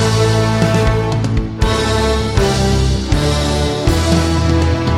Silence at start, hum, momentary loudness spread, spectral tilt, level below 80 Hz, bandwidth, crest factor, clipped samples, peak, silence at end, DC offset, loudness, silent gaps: 0 s; none; 3 LU; -5.5 dB/octave; -20 dBFS; 15 kHz; 12 dB; under 0.1%; -2 dBFS; 0 s; under 0.1%; -15 LUFS; none